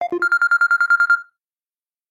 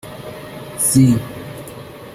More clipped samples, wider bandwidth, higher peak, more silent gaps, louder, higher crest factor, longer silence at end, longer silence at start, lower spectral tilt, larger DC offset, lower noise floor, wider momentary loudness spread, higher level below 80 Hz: neither; second, 13.5 kHz vs 16 kHz; second, -6 dBFS vs -2 dBFS; neither; about the same, -16 LUFS vs -15 LUFS; second, 12 dB vs 18 dB; first, 0.85 s vs 0 s; about the same, 0 s vs 0.05 s; second, -2 dB/octave vs -5.5 dB/octave; neither; first, under -90 dBFS vs -34 dBFS; second, 4 LU vs 21 LU; second, -76 dBFS vs -46 dBFS